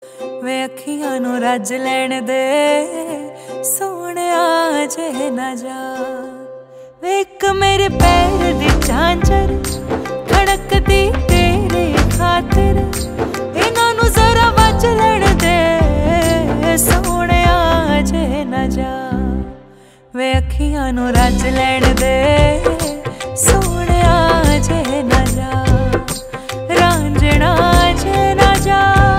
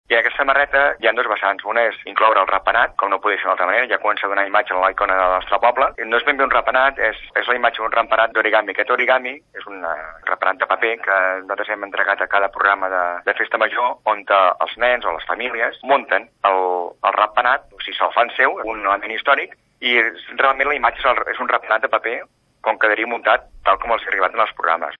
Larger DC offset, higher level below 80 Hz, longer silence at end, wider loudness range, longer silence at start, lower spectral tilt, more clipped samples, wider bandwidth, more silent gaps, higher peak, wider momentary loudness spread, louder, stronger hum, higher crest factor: neither; first, -20 dBFS vs -50 dBFS; about the same, 0 s vs 0.05 s; first, 6 LU vs 2 LU; about the same, 0 s vs 0.1 s; about the same, -5 dB/octave vs -4.5 dB/octave; neither; first, 16.5 kHz vs 5.2 kHz; neither; about the same, 0 dBFS vs 0 dBFS; first, 11 LU vs 6 LU; first, -14 LUFS vs -18 LUFS; neither; about the same, 14 dB vs 18 dB